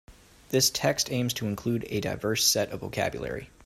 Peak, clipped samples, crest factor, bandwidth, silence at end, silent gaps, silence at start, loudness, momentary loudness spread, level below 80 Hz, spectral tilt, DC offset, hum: -10 dBFS; under 0.1%; 20 dB; 16 kHz; 0.2 s; none; 0.1 s; -27 LUFS; 9 LU; -54 dBFS; -3 dB/octave; under 0.1%; none